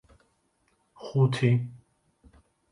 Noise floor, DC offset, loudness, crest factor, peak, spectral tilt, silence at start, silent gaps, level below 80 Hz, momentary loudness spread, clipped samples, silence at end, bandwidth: -71 dBFS; under 0.1%; -26 LUFS; 20 dB; -10 dBFS; -7.5 dB/octave; 1 s; none; -64 dBFS; 18 LU; under 0.1%; 0.95 s; 11 kHz